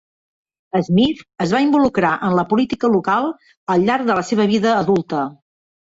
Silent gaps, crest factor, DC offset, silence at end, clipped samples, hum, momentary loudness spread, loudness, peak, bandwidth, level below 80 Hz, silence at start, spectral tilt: 3.57-3.67 s; 14 dB; under 0.1%; 0.6 s; under 0.1%; none; 8 LU; -17 LUFS; -4 dBFS; 8 kHz; -52 dBFS; 0.75 s; -6.5 dB/octave